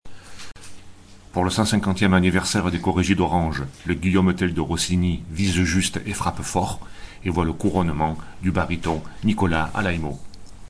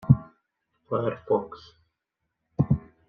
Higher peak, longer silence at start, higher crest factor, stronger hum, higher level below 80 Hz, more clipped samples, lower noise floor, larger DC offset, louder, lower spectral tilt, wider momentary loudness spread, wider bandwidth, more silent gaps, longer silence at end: about the same, -4 dBFS vs -4 dBFS; about the same, 0.05 s vs 0.05 s; second, 18 dB vs 24 dB; neither; first, -38 dBFS vs -50 dBFS; neither; second, -43 dBFS vs -82 dBFS; neither; first, -22 LUFS vs -27 LUFS; second, -5 dB/octave vs -11 dB/octave; second, 10 LU vs 18 LU; first, 11 kHz vs 5 kHz; neither; second, 0.05 s vs 0.3 s